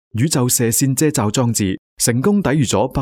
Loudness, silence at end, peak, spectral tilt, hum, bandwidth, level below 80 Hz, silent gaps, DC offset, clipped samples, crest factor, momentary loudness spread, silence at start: -16 LUFS; 0 s; -2 dBFS; -4.5 dB/octave; none; 20 kHz; -46 dBFS; 1.78-1.97 s; under 0.1%; under 0.1%; 14 dB; 4 LU; 0.15 s